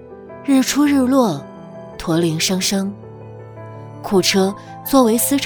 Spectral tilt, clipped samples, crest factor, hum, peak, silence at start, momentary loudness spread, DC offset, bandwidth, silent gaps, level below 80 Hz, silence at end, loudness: -4 dB/octave; under 0.1%; 18 dB; none; 0 dBFS; 0 s; 21 LU; under 0.1%; over 20 kHz; none; -48 dBFS; 0 s; -16 LUFS